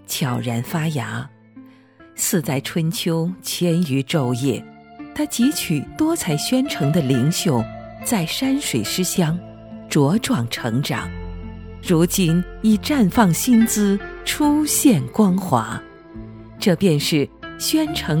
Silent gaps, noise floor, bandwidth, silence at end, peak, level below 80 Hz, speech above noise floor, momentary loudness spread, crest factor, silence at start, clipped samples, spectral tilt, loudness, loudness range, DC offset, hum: none; -47 dBFS; 19.5 kHz; 0 s; 0 dBFS; -44 dBFS; 28 dB; 15 LU; 20 dB; 0.1 s; under 0.1%; -5 dB/octave; -20 LUFS; 5 LU; under 0.1%; none